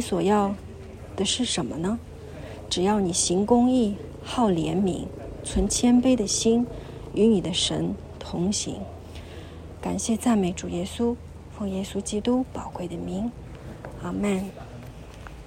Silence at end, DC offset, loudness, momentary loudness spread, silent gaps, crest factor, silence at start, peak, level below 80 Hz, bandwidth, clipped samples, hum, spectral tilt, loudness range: 0 s; under 0.1%; -25 LUFS; 20 LU; none; 20 dB; 0 s; -6 dBFS; -44 dBFS; 15.5 kHz; under 0.1%; none; -4.5 dB/octave; 7 LU